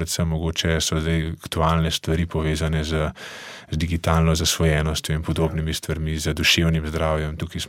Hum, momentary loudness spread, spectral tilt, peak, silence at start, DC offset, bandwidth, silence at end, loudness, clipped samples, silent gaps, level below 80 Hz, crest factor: none; 8 LU; -4.5 dB/octave; -4 dBFS; 0 s; under 0.1%; 16.5 kHz; 0 s; -22 LUFS; under 0.1%; none; -32 dBFS; 18 dB